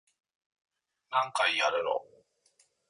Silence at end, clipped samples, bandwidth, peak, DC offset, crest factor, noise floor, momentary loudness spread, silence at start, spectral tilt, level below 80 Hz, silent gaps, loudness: 0.85 s; under 0.1%; 11.5 kHz; -14 dBFS; under 0.1%; 20 dB; -70 dBFS; 7 LU; 1.1 s; -1 dB/octave; -80 dBFS; none; -29 LUFS